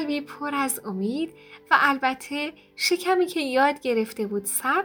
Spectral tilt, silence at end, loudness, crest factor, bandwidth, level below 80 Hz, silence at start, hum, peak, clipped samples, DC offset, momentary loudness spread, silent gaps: -3 dB/octave; 0 s; -24 LUFS; 22 dB; over 20 kHz; -70 dBFS; 0 s; none; -4 dBFS; under 0.1%; under 0.1%; 10 LU; none